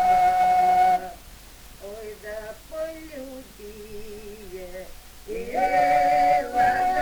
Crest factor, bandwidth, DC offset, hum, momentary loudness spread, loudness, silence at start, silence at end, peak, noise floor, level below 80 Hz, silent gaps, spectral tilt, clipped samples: 14 dB; over 20 kHz; under 0.1%; none; 22 LU; -21 LUFS; 0 s; 0 s; -10 dBFS; -45 dBFS; -46 dBFS; none; -4 dB/octave; under 0.1%